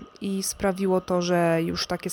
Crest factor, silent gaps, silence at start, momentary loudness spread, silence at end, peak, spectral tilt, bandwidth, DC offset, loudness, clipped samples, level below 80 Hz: 12 dB; none; 0 s; 6 LU; 0 s; -12 dBFS; -5 dB/octave; 19 kHz; under 0.1%; -25 LUFS; under 0.1%; -52 dBFS